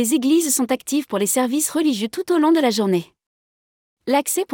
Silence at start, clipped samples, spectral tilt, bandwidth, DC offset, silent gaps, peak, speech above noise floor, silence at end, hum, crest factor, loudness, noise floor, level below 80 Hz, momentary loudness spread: 0 s; under 0.1%; -3.5 dB/octave; 19.5 kHz; under 0.1%; 3.26-3.97 s; -6 dBFS; over 71 dB; 0 s; none; 14 dB; -19 LUFS; under -90 dBFS; -68 dBFS; 6 LU